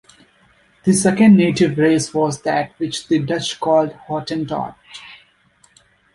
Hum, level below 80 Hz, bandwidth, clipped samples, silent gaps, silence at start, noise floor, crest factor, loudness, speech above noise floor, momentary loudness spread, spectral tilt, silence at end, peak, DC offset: none; -54 dBFS; 11.5 kHz; under 0.1%; none; 0.85 s; -56 dBFS; 16 dB; -17 LUFS; 39 dB; 14 LU; -5.5 dB/octave; 1 s; -2 dBFS; under 0.1%